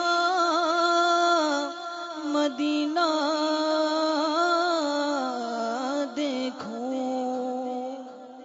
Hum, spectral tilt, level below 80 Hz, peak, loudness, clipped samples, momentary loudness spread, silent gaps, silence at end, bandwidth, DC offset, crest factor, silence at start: none; -2 dB/octave; -80 dBFS; -12 dBFS; -26 LUFS; under 0.1%; 11 LU; none; 0 s; 7.8 kHz; under 0.1%; 14 dB; 0 s